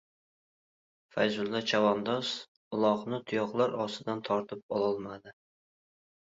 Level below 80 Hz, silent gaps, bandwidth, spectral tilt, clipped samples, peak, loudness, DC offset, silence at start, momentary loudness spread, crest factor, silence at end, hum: -74 dBFS; 2.48-2.71 s, 4.63-4.69 s; 8 kHz; -5 dB/octave; under 0.1%; -14 dBFS; -31 LUFS; under 0.1%; 1.15 s; 11 LU; 20 dB; 1 s; none